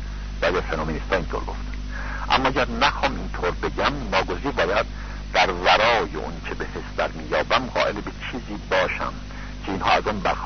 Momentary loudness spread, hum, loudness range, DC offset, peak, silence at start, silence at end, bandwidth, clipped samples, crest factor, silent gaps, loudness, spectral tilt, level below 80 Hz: 12 LU; 50 Hz at -35 dBFS; 3 LU; under 0.1%; -4 dBFS; 0 s; 0 s; 6.6 kHz; under 0.1%; 20 dB; none; -23 LUFS; -4.5 dB/octave; -34 dBFS